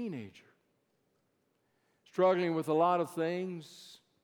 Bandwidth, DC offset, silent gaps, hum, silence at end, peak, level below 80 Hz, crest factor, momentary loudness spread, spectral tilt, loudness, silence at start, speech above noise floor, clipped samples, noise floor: 19 kHz; under 0.1%; none; none; 0.3 s; -16 dBFS; -86 dBFS; 18 dB; 21 LU; -6.5 dB/octave; -31 LUFS; 0 s; 45 dB; under 0.1%; -77 dBFS